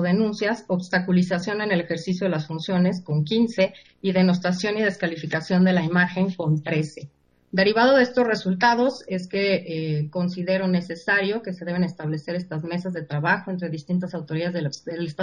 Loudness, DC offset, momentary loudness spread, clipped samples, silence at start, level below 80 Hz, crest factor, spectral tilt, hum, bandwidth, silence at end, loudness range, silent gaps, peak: -23 LUFS; under 0.1%; 10 LU; under 0.1%; 0 s; -62 dBFS; 18 dB; -6.5 dB/octave; none; 9.6 kHz; 0 s; 4 LU; none; -4 dBFS